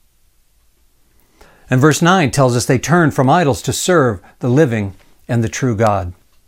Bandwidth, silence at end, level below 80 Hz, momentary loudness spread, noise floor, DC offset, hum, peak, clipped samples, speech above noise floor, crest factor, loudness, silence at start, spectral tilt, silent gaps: 16.5 kHz; 0.35 s; -44 dBFS; 9 LU; -55 dBFS; under 0.1%; none; 0 dBFS; under 0.1%; 41 dB; 16 dB; -14 LUFS; 1.7 s; -5.5 dB/octave; none